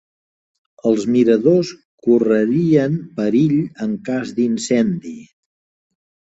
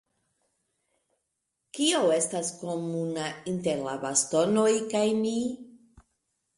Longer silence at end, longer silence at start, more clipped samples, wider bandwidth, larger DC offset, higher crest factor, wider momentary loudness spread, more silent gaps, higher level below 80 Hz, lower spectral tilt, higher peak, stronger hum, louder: first, 1.15 s vs 0.8 s; second, 0.85 s vs 1.75 s; neither; second, 8 kHz vs 11.5 kHz; neither; about the same, 16 dB vs 18 dB; about the same, 10 LU vs 10 LU; first, 1.85-1.98 s vs none; first, -60 dBFS vs -68 dBFS; first, -7 dB/octave vs -3.5 dB/octave; first, -2 dBFS vs -10 dBFS; neither; first, -17 LUFS vs -27 LUFS